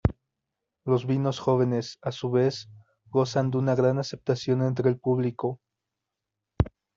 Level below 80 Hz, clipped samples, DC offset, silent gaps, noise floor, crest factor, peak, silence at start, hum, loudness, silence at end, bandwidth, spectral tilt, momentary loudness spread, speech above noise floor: -46 dBFS; under 0.1%; under 0.1%; none; -86 dBFS; 22 dB; -6 dBFS; 0.05 s; none; -26 LUFS; 0.3 s; 7.4 kHz; -7.5 dB/octave; 9 LU; 61 dB